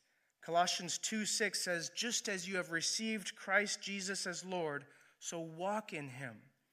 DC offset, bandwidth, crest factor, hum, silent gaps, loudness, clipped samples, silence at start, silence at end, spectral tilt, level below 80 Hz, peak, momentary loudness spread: under 0.1%; 15 kHz; 22 dB; none; none; -37 LUFS; under 0.1%; 0.4 s; 0.3 s; -2 dB/octave; -90 dBFS; -16 dBFS; 12 LU